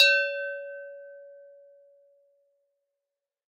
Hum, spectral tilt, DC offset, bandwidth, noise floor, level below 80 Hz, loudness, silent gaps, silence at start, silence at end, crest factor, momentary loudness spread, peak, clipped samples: none; 6.5 dB/octave; under 0.1%; 9.6 kHz; -88 dBFS; under -90 dBFS; -26 LUFS; none; 0 s; 2.2 s; 26 dB; 26 LU; -4 dBFS; under 0.1%